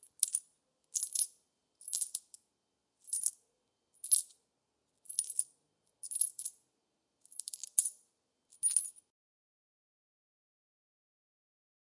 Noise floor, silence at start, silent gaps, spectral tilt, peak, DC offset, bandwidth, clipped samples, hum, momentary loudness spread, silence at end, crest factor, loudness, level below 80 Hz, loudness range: -83 dBFS; 0.2 s; none; 5 dB/octave; -8 dBFS; under 0.1%; 11.5 kHz; under 0.1%; none; 16 LU; 3.05 s; 32 dB; -34 LUFS; under -90 dBFS; 4 LU